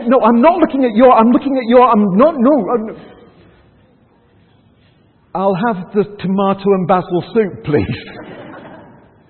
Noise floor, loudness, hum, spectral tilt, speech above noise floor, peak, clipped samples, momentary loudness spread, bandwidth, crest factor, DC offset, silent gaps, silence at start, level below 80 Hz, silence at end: -51 dBFS; -13 LUFS; none; -11.5 dB/octave; 39 dB; 0 dBFS; under 0.1%; 17 LU; 4.4 kHz; 14 dB; under 0.1%; none; 0 s; -48 dBFS; 0.55 s